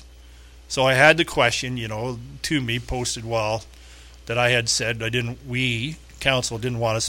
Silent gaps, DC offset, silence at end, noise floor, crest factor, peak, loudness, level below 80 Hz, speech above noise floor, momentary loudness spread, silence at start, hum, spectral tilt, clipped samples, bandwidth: none; under 0.1%; 0 s; -45 dBFS; 22 dB; -2 dBFS; -22 LUFS; -44 dBFS; 23 dB; 14 LU; 0 s; 60 Hz at -45 dBFS; -3.5 dB/octave; under 0.1%; 17 kHz